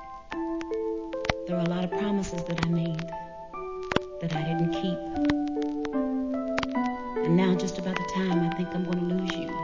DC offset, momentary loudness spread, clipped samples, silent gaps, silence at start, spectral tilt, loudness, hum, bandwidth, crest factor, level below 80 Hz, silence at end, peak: 0.2%; 7 LU; under 0.1%; none; 0 s; -6.5 dB/octave; -29 LUFS; none; 7.6 kHz; 22 dB; -50 dBFS; 0 s; -6 dBFS